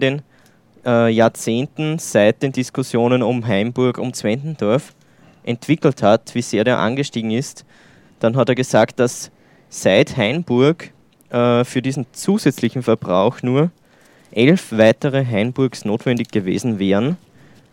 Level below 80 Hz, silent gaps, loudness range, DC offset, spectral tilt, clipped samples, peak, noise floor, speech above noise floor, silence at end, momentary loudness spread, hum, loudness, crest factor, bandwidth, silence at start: -62 dBFS; none; 2 LU; under 0.1%; -6 dB/octave; under 0.1%; 0 dBFS; -51 dBFS; 34 dB; 0.55 s; 8 LU; none; -18 LUFS; 18 dB; 16.5 kHz; 0 s